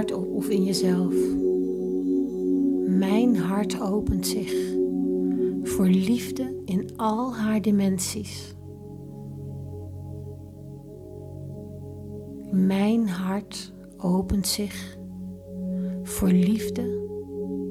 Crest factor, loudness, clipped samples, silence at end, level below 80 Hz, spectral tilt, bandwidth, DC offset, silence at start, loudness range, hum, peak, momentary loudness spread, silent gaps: 16 dB; -25 LUFS; under 0.1%; 0 s; -48 dBFS; -6 dB/octave; 15.5 kHz; under 0.1%; 0 s; 12 LU; none; -10 dBFS; 17 LU; none